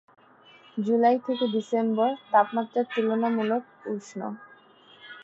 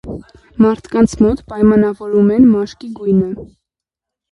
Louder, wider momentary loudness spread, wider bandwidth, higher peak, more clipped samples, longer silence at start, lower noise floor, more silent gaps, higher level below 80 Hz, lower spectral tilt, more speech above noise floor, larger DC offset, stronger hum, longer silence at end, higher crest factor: second, -26 LUFS vs -13 LUFS; second, 13 LU vs 18 LU; second, 7.8 kHz vs 10.5 kHz; second, -8 dBFS vs 0 dBFS; neither; first, 0.75 s vs 0.05 s; second, -54 dBFS vs -84 dBFS; neither; second, -80 dBFS vs -38 dBFS; second, -6.5 dB/octave vs -8 dB/octave; second, 29 dB vs 71 dB; neither; neither; second, 0 s vs 0.85 s; first, 20 dB vs 14 dB